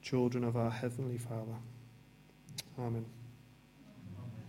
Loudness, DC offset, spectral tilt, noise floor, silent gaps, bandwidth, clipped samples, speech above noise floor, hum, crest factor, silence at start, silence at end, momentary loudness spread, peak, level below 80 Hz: -39 LUFS; under 0.1%; -7 dB/octave; -61 dBFS; none; 15.5 kHz; under 0.1%; 25 dB; none; 18 dB; 0 s; 0 s; 25 LU; -20 dBFS; -70 dBFS